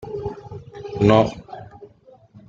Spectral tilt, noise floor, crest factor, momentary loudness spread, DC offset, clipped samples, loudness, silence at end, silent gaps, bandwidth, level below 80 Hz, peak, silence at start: -7.5 dB/octave; -50 dBFS; 22 dB; 23 LU; under 0.1%; under 0.1%; -19 LUFS; 0.1 s; none; 7.6 kHz; -48 dBFS; -2 dBFS; 0 s